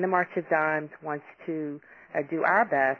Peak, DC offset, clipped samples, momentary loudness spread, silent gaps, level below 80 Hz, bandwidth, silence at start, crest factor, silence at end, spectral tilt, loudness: -10 dBFS; under 0.1%; under 0.1%; 13 LU; none; -76 dBFS; 6.6 kHz; 0 s; 18 dB; 0 s; -8.5 dB/octave; -28 LUFS